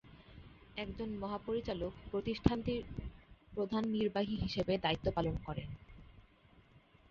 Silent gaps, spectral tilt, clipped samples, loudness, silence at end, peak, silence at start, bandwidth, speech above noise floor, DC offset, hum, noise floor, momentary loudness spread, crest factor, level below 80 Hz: none; -5 dB/octave; under 0.1%; -38 LUFS; 0.35 s; -12 dBFS; 0.05 s; 7.2 kHz; 28 dB; under 0.1%; none; -65 dBFS; 18 LU; 28 dB; -52 dBFS